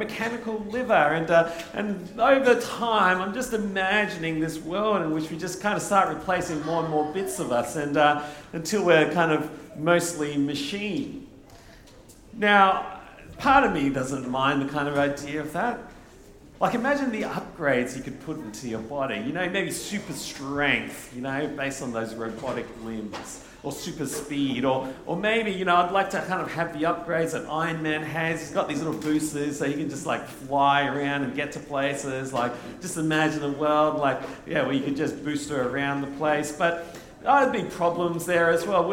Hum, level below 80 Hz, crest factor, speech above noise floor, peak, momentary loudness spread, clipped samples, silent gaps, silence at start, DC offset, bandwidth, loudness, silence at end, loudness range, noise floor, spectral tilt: none; -54 dBFS; 22 dB; 24 dB; -4 dBFS; 12 LU; under 0.1%; none; 0 s; under 0.1%; 17.5 kHz; -25 LUFS; 0 s; 5 LU; -49 dBFS; -4.5 dB/octave